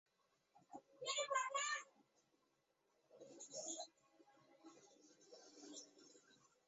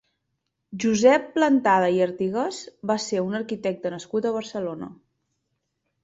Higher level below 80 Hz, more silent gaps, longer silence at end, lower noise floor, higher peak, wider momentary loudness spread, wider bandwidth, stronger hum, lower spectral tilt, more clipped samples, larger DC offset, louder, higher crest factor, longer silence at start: second, under -90 dBFS vs -66 dBFS; neither; second, 0.35 s vs 1.1 s; first, -84 dBFS vs -78 dBFS; second, -28 dBFS vs -4 dBFS; first, 25 LU vs 13 LU; about the same, 8 kHz vs 8 kHz; neither; second, 2 dB/octave vs -5 dB/octave; neither; neither; second, -46 LUFS vs -23 LUFS; about the same, 24 dB vs 20 dB; second, 0.55 s vs 0.7 s